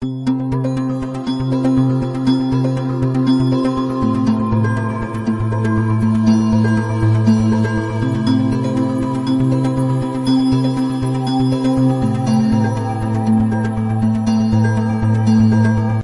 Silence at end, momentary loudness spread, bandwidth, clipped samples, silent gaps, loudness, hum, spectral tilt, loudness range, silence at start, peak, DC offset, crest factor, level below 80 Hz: 0 s; 5 LU; 11.5 kHz; under 0.1%; none; -16 LUFS; none; -8 dB/octave; 1 LU; 0 s; -2 dBFS; under 0.1%; 12 dB; -38 dBFS